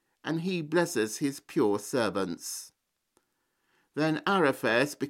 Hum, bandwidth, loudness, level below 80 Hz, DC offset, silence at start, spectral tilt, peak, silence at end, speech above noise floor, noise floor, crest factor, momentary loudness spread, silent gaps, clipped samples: none; 16.5 kHz; -29 LUFS; -76 dBFS; under 0.1%; 0.25 s; -4.5 dB/octave; -12 dBFS; 0 s; 48 dB; -77 dBFS; 18 dB; 10 LU; none; under 0.1%